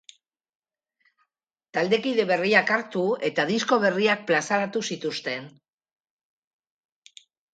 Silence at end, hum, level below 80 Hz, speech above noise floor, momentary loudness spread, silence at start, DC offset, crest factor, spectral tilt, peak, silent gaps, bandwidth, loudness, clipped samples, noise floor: 2.05 s; none; -76 dBFS; 58 dB; 10 LU; 1.75 s; under 0.1%; 22 dB; -4 dB/octave; -4 dBFS; none; 9.2 kHz; -24 LUFS; under 0.1%; -82 dBFS